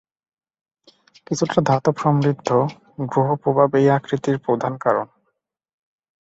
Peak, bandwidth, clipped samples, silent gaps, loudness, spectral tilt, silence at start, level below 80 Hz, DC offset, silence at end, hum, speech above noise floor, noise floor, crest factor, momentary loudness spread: -2 dBFS; 8 kHz; under 0.1%; none; -20 LUFS; -7 dB/octave; 1.3 s; -60 dBFS; under 0.1%; 1.15 s; none; 55 dB; -74 dBFS; 20 dB; 7 LU